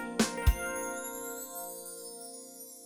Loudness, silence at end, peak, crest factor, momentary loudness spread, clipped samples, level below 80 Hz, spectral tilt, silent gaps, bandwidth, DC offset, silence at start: -35 LUFS; 0 s; -12 dBFS; 22 dB; 15 LU; under 0.1%; -40 dBFS; -4 dB/octave; none; 17.5 kHz; under 0.1%; 0 s